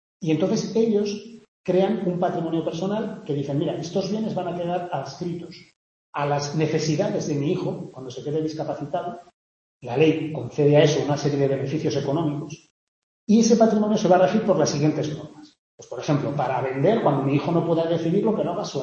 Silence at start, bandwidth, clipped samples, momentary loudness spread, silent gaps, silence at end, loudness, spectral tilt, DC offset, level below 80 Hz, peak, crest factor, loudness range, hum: 0.2 s; 7.8 kHz; under 0.1%; 15 LU; 1.48-1.64 s, 5.76-6.13 s, 9.34-9.81 s, 12.70-13.27 s, 15.58-15.78 s; 0 s; -23 LUFS; -6.5 dB/octave; under 0.1%; -62 dBFS; -4 dBFS; 18 dB; 6 LU; none